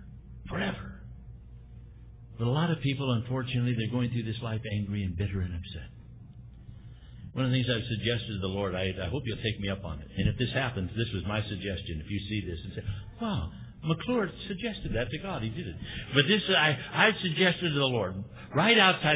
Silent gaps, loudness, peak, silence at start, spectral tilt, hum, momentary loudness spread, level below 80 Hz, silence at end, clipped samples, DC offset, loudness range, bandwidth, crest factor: none; -29 LUFS; -6 dBFS; 0 s; -3.5 dB/octave; none; 24 LU; -46 dBFS; 0 s; under 0.1%; under 0.1%; 8 LU; 4 kHz; 24 dB